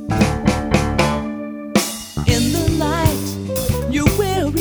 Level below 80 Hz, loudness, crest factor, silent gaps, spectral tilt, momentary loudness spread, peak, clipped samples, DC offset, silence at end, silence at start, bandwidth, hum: -28 dBFS; -19 LUFS; 18 dB; none; -5 dB/octave; 7 LU; 0 dBFS; under 0.1%; under 0.1%; 0 s; 0 s; over 20 kHz; none